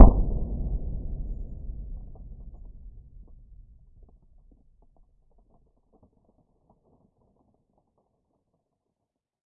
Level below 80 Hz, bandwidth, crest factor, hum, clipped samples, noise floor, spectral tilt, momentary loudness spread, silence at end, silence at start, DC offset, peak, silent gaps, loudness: -30 dBFS; 1.4 kHz; 26 dB; none; under 0.1%; -84 dBFS; -14 dB/octave; 23 LU; 6.55 s; 0 s; under 0.1%; 0 dBFS; none; -30 LUFS